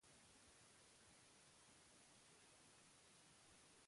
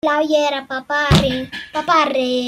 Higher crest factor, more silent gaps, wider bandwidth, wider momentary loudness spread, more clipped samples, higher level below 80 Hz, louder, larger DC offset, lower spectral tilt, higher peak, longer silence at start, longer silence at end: about the same, 14 dB vs 18 dB; neither; second, 11.5 kHz vs 16 kHz; second, 0 LU vs 10 LU; neither; second, -88 dBFS vs -36 dBFS; second, -68 LUFS vs -17 LUFS; neither; second, -2 dB/octave vs -5 dB/octave; second, -56 dBFS vs 0 dBFS; about the same, 0 s vs 0.05 s; about the same, 0 s vs 0 s